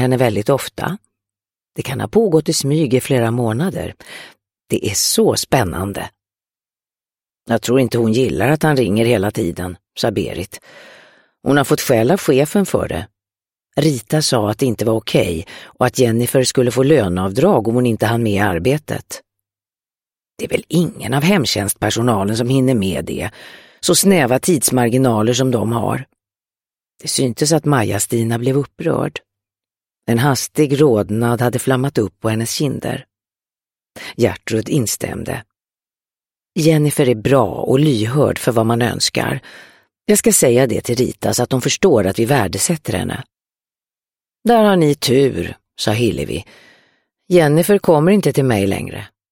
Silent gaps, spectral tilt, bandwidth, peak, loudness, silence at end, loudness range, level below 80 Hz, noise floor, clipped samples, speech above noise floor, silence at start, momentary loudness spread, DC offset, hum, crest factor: none; -5 dB/octave; 16.5 kHz; 0 dBFS; -16 LUFS; 0.25 s; 4 LU; -46 dBFS; under -90 dBFS; under 0.1%; over 74 dB; 0 s; 13 LU; under 0.1%; none; 16 dB